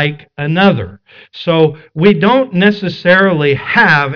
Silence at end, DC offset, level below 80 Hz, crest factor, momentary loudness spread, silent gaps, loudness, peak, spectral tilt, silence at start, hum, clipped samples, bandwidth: 0 s; under 0.1%; -48 dBFS; 12 dB; 10 LU; none; -11 LUFS; 0 dBFS; -8 dB/octave; 0 s; none; under 0.1%; 5.4 kHz